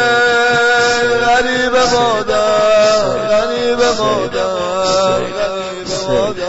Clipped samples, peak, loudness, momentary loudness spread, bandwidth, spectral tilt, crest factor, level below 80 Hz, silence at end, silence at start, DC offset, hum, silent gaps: under 0.1%; -4 dBFS; -13 LUFS; 6 LU; 8 kHz; -3 dB/octave; 10 dB; -40 dBFS; 0 s; 0 s; under 0.1%; none; none